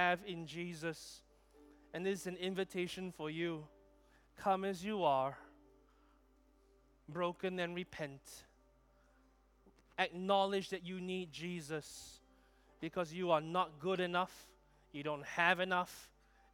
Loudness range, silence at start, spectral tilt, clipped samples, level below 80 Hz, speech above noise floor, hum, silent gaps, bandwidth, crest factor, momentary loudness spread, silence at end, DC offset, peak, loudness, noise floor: 8 LU; 0 s; -5 dB/octave; under 0.1%; -72 dBFS; 31 dB; none; none; 18.5 kHz; 24 dB; 17 LU; 0.45 s; under 0.1%; -16 dBFS; -39 LUFS; -70 dBFS